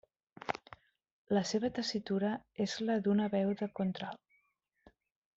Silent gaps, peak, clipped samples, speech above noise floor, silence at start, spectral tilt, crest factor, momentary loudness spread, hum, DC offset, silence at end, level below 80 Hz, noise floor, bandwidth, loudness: 1.12-1.25 s; -16 dBFS; under 0.1%; 44 dB; 0.45 s; -5.5 dB/octave; 20 dB; 11 LU; none; under 0.1%; 1.2 s; -72 dBFS; -78 dBFS; 7.8 kHz; -35 LUFS